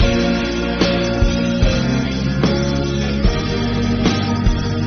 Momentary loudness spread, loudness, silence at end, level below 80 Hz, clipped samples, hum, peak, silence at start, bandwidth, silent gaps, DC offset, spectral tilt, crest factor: 3 LU; -18 LUFS; 0 s; -24 dBFS; under 0.1%; none; -4 dBFS; 0 s; 6.6 kHz; none; under 0.1%; -5.5 dB/octave; 14 dB